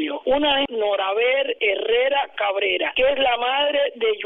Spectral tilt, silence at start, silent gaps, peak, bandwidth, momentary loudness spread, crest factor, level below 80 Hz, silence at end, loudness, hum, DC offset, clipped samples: -5.5 dB/octave; 0 s; none; -6 dBFS; 4 kHz; 3 LU; 14 dB; -52 dBFS; 0 s; -20 LUFS; none; under 0.1%; under 0.1%